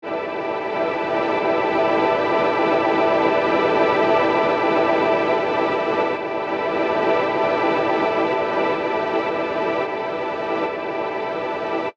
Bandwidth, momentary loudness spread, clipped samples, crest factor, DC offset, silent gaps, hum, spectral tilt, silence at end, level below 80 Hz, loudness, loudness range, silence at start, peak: 8 kHz; 7 LU; under 0.1%; 14 dB; under 0.1%; none; none; -6 dB/octave; 0.05 s; -58 dBFS; -20 LUFS; 4 LU; 0.05 s; -6 dBFS